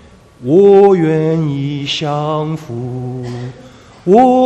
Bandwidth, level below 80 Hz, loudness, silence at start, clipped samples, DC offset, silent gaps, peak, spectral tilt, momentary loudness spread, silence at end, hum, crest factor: 8.4 kHz; -48 dBFS; -13 LUFS; 0.4 s; 0.2%; under 0.1%; none; 0 dBFS; -7.5 dB/octave; 17 LU; 0 s; none; 12 dB